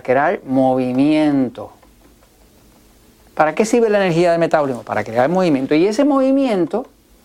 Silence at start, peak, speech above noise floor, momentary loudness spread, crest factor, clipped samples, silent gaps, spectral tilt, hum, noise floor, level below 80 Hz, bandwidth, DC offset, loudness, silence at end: 0.05 s; 0 dBFS; 34 dB; 8 LU; 16 dB; under 0.1%; none; -6.5 dB/octave; none; -50 dBFS; -54 dBFS; 13 kHz; under 0.1%; -16 LUFS; 0.4 s